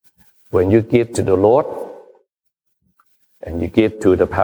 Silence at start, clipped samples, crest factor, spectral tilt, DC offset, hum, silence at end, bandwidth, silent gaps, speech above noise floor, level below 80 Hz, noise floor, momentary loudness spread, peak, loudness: 0.55 s; under 0.1%; 16 dB; -7 dB/octave; under 0.1%; none; 0 s; over 20 kHz; none; 57 dB; -44 dBFS; -71 dBFS; 16 LU; -2 dBFS; -16 LUFS